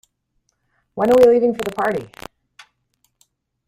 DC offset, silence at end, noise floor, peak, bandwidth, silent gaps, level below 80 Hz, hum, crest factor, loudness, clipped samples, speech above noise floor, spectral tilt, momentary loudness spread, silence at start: under 0.1%; 1.6 s; -69 dBFS; -2 dBFS; 15.5 kHz; none; -54 dBFS; none; 18 dB; -16 LUFS; under 0.1%; 54 dB; -6 dB/octave; 26 LU; 0.95 s